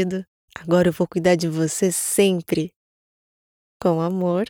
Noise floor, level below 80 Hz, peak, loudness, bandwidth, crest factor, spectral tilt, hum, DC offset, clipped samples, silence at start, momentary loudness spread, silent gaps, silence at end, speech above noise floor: under -90 dBFS; -56 dBFS; -6 dBFS; -21 LUFS; 18.5 kHz; 16 dB; -5 dB/octave; none; under 0.1%; under 0.1%; 0 s; 12 LU; 0.28-0.48 s, 2.76-3.80 s; 0.05 s; over 70 dB